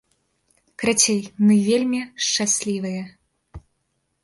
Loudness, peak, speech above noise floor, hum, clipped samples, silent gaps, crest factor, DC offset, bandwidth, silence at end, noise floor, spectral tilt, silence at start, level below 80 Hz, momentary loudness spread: -20 LUFS; -2 dBFS; 52 dB; none; under 0.1%; none; 20 dB; under 0.1%; 11.5 kHz; 0.65 s; -72 dBFS; -3.5 dB/octave; 0.8 s; -56 dBFS; 11 LU